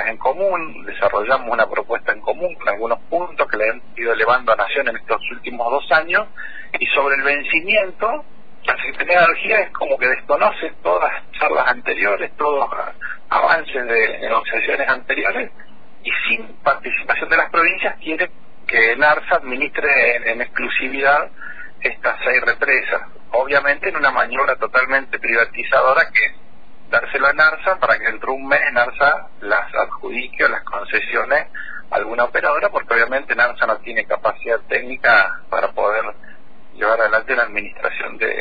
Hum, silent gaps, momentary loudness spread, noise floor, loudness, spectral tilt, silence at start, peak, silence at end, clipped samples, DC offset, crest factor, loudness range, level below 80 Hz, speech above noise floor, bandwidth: none; none; 9 LU; -47 dBFS; -17 LUFS; -5.5 dB/octave; 0 s; -2 dBFS; 0 s; under 0.1%; 3%; 16 dB; 3 LU; -50 dBFS; 29 dB; 5 kHz